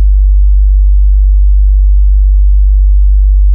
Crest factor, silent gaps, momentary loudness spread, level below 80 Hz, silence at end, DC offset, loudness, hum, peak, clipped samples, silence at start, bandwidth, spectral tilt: 4 dB; none; 0 LU; -4 dBFS; 0 s; under 0.1%; -10 LUFS; none; -2 dBFS; under 0.1%; 0 s; 0.2 kHz; -18.5 dB/octave